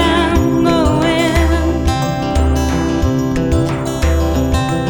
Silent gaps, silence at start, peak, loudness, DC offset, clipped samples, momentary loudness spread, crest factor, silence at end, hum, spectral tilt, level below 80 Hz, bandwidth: none; 0 s; 0 dBFS; -15 LUFS; under 0.1%; under 0.1%; 4 LU; 12 dB; 0 s; none; -6 dB/octave; -20 dBFS; 18.5 kHz